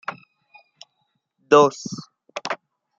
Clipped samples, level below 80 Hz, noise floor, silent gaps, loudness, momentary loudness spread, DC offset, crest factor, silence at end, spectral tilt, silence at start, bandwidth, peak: under 0.1%; -68 dBFS; -73 dBFS; none; -19 LUFS; 20 LU; under 0.1%; 22 dB; 0.45 s; -4.5 dB/octave; 0.1 s; 7.6 kHz; -2 dBFS